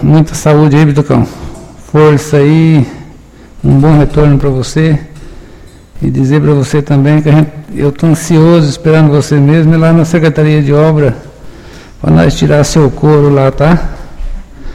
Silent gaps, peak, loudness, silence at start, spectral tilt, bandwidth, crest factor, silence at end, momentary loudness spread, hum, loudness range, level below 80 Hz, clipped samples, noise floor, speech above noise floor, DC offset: none; 0 dBFS; -8 LUFS; 0 s; -7.5 dB/octave; 12.5 kHz; 8 dB; 0 s; 10 LU; none; 3 LU; -24 dBFS; 1%; -33 dBFS; 27 dB; under 0.1%